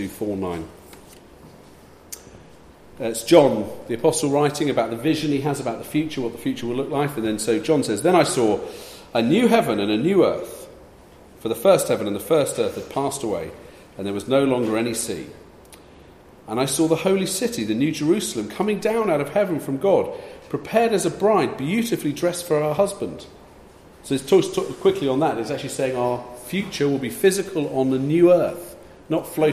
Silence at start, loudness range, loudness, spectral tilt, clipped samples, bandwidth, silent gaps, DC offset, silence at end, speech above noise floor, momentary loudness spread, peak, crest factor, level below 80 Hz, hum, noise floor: 0 s; 3 LU; -21 LUFS; -5 dB/octave; under 0.1%; 15.5 kHz; none; under 0.1%; 0 s; 26 dB; 13 LU; 0 dBFS; 22 dB; -54 dBFS; none; -47 dBFS